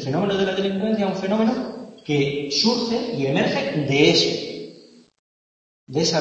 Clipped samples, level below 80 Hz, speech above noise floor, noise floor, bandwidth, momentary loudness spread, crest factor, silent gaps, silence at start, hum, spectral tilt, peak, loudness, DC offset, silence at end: under 0.1%; -58 dBFS; 27 dB; -47 dBFS; 8.4 kHz; 13 LU; 20 dB; 5.19-5.87 s; 0 s; none; -4.5 dB/octave; -2 dBFS; -21 LUFS; under 0.1%; 0 s